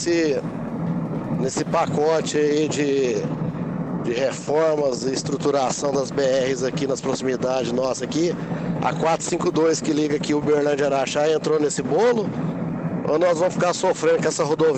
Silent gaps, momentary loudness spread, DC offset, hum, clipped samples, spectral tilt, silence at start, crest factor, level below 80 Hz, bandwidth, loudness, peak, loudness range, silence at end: none; 7 LU; under 0.1%; none; under 0.1%; -5 dB/octave; 0 s; 12 dB; -54 dBFS; 9.2 kHz; -22 LUFS; -10 dBFS; 2 LU; 0 s